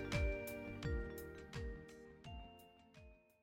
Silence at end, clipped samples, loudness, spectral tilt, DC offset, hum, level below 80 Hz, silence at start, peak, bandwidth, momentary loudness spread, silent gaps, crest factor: 0.25 s; under 0.1%; -47 LUFS; -6 dB/octave; under 0.1%; none; -50 dBFS; 0 s; -26 dBFS; 17.5 kHz; 22 LU; none; 20 dB